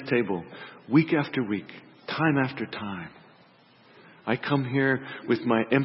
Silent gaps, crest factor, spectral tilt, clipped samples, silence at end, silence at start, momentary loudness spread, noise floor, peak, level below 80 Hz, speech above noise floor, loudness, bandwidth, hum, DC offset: none; 20 dB; -11 dB/octave; under 0.1%; 0 s; 0 s; 17 LU; -57 dBFS; -8 dBFS; -70 dBFS; 31 dB; -27 LUFS; 5.8 kHz; none; under 0.1%